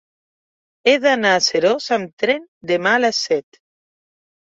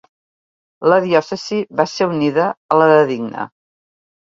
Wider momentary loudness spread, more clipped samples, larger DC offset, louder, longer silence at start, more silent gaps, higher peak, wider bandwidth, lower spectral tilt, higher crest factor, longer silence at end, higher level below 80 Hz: second, 7 LU vs 12 LU; neither; neither; about the same, -17 LUFS vs -16 LUFS; about the same, 0.85 s vs 0.8 s; about the same, 2.13-2.17 s, 2.48-2.61 s vs 2.57-2.69 s; about the same, -2 dBFS vs 0 dBFS; about the same, 7.8 kHz vs 7.6 kHz; second, -2.5 dB/octave vs -6 dB/octave; about the same, 18 dB vs 18 dB; first, 1 s vs 0.85 s; about the same, -68 dBFS vs -64 dBFS